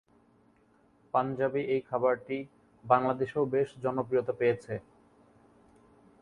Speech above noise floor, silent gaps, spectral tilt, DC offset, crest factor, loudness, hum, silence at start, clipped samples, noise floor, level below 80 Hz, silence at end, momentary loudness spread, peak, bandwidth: 36 dB; none; -8 dB/octave; under 0.1%; 24 dB; -30 LUFS; none; 1.15 s; under 0.1%; -65 dBFS; -70 dBFS; 1.4 s; 11 LU; -8 dBFS; 10.5 kHz